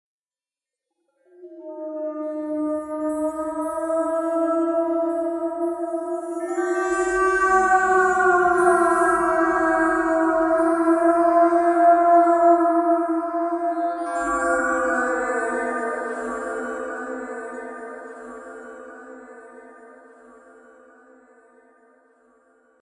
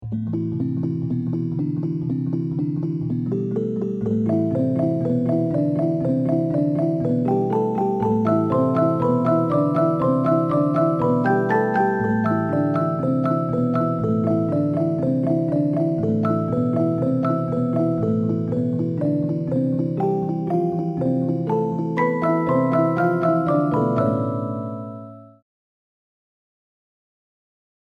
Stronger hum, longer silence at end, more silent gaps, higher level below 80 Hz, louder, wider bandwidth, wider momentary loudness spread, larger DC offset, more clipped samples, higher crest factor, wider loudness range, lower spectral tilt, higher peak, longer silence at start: neither; first, 2.9 s vs 2.6 s; neither; about the same, -54 dBFS vs -56 dBFS; about the same, -21 LUFS vs -21 LUFS; first, 11.5 kHz vs 5.8 kHz; first, 18 LU vs 5 LU; neither; neither; about the same, 18 dB vs 14 dB; first, 15 LU vs 5 LU; second, -4.5 dB/octave vs -10.5 dB/octave; about the same, -4 dBFS vs -6 dBFS; first, 1.4 s vs 0 s